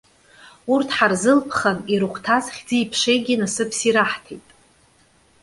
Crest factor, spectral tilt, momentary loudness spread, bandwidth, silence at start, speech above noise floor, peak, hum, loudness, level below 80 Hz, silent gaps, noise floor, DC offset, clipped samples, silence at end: 20 dB; -3.5 dB/octave; 6 LU; 11.5 kHz; 0.45 s; 37 dB; -2 dBFS; none; -20 LUFS; -60 dBFS; none; -57 dBFS; under 0.1%; under 0.1%; 1.05 s